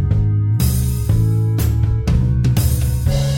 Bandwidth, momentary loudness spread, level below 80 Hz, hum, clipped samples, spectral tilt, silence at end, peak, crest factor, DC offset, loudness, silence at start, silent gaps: 17.5 kHz; 2 LU; -22 dBFS; none; under 0.1%; -6.5 dB/octave; 0 s; -4 dBFS; 10 dB; under 0.1%; -17 LUFS; 0 s; none